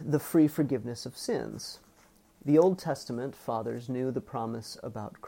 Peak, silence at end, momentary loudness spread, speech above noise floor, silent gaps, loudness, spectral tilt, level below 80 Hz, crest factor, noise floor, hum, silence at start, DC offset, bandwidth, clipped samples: -12 dBFS; 0 s; 16 LU; 32 dB; none; -30 LUFS; -6.5 dB/octave; -66 dBFS; 18 dB; -61 dBFS; none; 0 s; under 0.1%; 16.5 kHz; under 0.1%